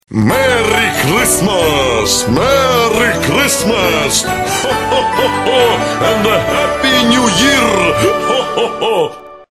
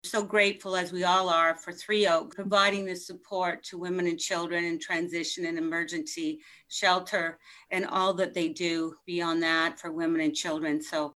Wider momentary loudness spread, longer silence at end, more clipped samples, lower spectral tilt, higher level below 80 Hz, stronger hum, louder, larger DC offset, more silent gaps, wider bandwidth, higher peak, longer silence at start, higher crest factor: second, 5 LU vs 9 LU; about the same, 0.1 s vs 0.05 s; neither; about the same, -3.5 dB/octave vs -3.5 dB/octave; first, -34 dBFS vs -76 dBFS; neither; first, -11 LUFS vs -28 LUFS; neither; neither; about the same, 13.5 kHz vs 13 kHz; first, 0 dBFS vs -10 dBFS; about the same, 0.1 s vs 0.05 s; second, 12 dB vs 20 dB